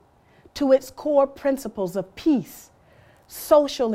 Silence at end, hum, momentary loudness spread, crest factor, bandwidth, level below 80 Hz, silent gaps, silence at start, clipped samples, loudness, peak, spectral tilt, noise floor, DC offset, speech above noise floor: 0 s; none; 18 LU; 20 dB; 16 kHz; -56 dBFS; none; 0.55 s; under 0.1%; -22 LUFS; -4 dBFS; -5 dB/octave; -55 dBFS; under 0.1%; 33 dB